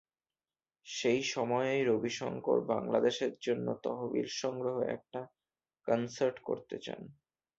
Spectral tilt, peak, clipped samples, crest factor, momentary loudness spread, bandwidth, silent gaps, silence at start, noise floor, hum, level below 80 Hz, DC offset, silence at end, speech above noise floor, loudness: -4.5 dB/octave; -16 dBFS; under 0.1%; 20 dB; 14 LU; 8 kHz; none; 0.85 s; under -90 dBFS; none; -74 dBFS; under 0.1%; 0.45 s; over 56 dB; -34 LUFS